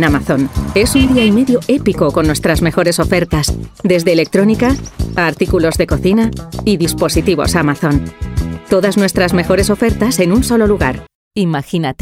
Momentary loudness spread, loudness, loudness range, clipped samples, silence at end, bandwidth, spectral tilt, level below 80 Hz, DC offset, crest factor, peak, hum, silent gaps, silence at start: 7 LU; -13 LUFS; 2 LU; under 0.1%; 0.1 s; 16.5 kHz; -5.5 dB/octave; -26 dBFS; under 0.1%; 12 dB; 0 dBFS; none; 11.15-11.31 s; 0 s